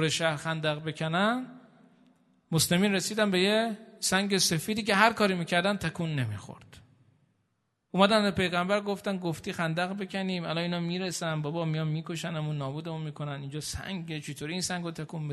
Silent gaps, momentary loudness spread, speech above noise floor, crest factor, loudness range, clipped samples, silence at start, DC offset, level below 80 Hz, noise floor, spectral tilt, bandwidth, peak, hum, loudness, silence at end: none; 12 LU; 48 dB; 24 dB; 7 LU; under 0.1%; 0 s; under 0.1%; -62 dBFS; -77 dBFS; -4 dB/octave; 12.5 kHz; -6 dBFS; none; -29 LUFS; 0 s